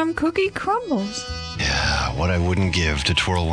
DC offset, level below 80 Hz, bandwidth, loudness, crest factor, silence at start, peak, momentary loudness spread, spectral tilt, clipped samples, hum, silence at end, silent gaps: under 0.1%; -32 dBFS; 10.5 kHz; -21 LUFS; 14 dB; 0 s; -6 dBFS; 5 LU; -4.5 dB/octave; under 0.1%; none; 0 s; none